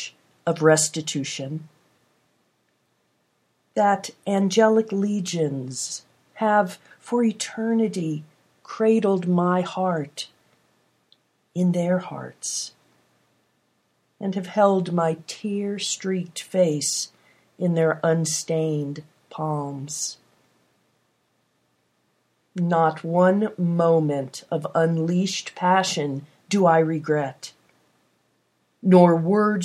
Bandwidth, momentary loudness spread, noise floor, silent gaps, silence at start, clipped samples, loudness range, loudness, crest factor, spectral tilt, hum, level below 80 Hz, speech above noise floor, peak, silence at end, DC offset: 14.5 kHz; 13 LU; -69 dBFS; none; 0 s; under 0.1%; 7 LU; -23 LUFS; 22 dB; -5 dB/octave; none; -76 dBFS; 47 dB; -2 dBFS; 0 s; under 0.1%